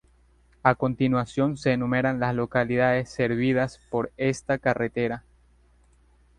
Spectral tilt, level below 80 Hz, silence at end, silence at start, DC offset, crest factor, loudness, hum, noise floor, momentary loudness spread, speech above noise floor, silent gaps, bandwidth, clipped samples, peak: -7 dB/octave; -54 dBFS; 1.2 s; 0.65 s; under 0.1%; 22 dB; -25 LUFS; 60 Hz at -45 dBFS; -60 dBFS; 6 LU; 35 dB; none; 10.5 kHz; under 0.1%; -2 dBFS